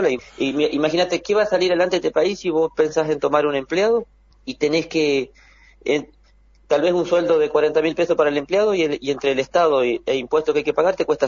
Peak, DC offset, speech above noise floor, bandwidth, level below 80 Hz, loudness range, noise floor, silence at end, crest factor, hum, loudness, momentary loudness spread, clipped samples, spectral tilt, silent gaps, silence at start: -2 dBFS; under 0.1%; 34 dB; 7.4 kHz; -54 dBFS; 3 LU; -53 dBFS; 0 s; 18 dB; none; -20 LUFS; 5 LU; under 0.1%; -5 dB/octave; none; 0 s